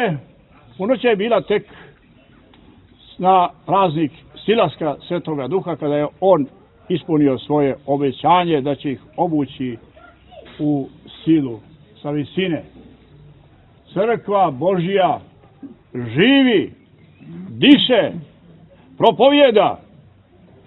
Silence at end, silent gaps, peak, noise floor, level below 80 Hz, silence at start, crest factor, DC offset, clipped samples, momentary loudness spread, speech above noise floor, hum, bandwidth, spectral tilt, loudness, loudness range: 0.9 s; none; 0 dBFS; -49 dBFS; -56 dBFS; 0 s; 18 dB; under 0.1%; under 0.1%; 16 LU; 33 dB; none; 4.2 kHz; -9 dB/octave; -18 LUFS; 7 LU